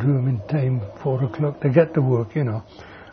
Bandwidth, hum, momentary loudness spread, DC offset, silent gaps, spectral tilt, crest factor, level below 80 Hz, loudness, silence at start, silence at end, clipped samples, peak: 5.4 kHz; none; 10 LU; under 0.1%; none; -11 dB/octave; 18 dB; -54 dBFS; -22 LUFS; 0 s; 0 s; under 0.1%; -2 dBFS